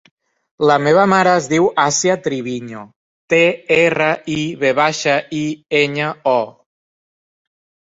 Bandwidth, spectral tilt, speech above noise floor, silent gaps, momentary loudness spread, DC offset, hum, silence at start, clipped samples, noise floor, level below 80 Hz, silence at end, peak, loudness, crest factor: 8 kHz; -4 dB/octave; over 74 dB; 2.96-3.28 s; 11 LU; under 0.1%; none; 0.6 s; under 0.1%; under -90 dBFS; -58 dBFS; 1.4 s; -2 dBFS; -15 LUFS; 16 dB